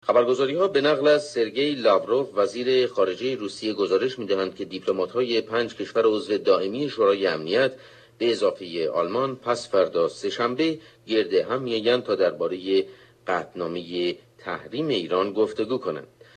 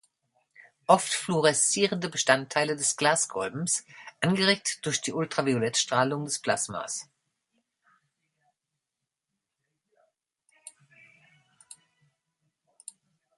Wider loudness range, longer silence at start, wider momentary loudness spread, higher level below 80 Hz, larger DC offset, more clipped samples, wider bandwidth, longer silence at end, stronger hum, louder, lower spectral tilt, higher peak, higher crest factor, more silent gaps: second, 4 LU vs 10 LU; second, 0.05 s vs 0.9 s; second, 8 LU vs 12 LU; about the same, -70 dBFS vs -72 dBFS; neither; neither; second, 9.4 kHz vs 11.5 kHz; second, 0.3 s vs 2.7 s; neither; about the same, -24 LUFS vs -26 LUFS; first, -5 dB/octave vs -3 dB/octave; about the same, -6 dBFS vs -4 dBFS; second, 18 dB vs 26 dB; neither